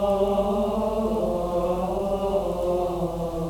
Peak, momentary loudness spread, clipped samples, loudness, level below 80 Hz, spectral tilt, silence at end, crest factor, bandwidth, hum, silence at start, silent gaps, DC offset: -10 dBFS; 3 LU; under 0.1%; -25 LUFS; -38 dBFS; -7.5 dB/octave; 0 s; 14 dB; 19.5 kHz; none; 0 s; none; under 0.1%